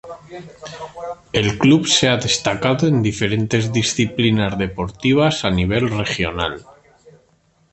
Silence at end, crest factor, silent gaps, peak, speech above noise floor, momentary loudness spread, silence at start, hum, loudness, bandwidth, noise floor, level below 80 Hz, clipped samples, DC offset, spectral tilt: 1.15 s; 18 dB; none; -2 dBFS; 40 dB; 19 LU; 0.05 s; none; -17 LUFS; 8.8 kHz; -59 dBFS; -40 dBFS; under 0.1%; under 0.1%; -4.5 dB/octave